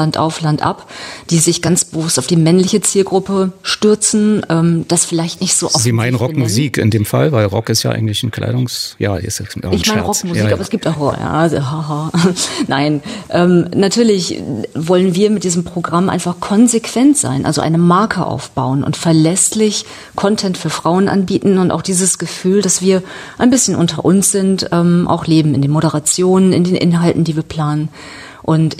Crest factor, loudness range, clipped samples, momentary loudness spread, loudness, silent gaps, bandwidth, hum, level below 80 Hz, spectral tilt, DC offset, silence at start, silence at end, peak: 12 dB; 3 LU; under 0.1%; 7 LU; -14 LUFS; none; 15.5 kHz; none; -48 dBFS; -5 dB/octave; under 0.1%; 0 s; 0 s; 0 dBFS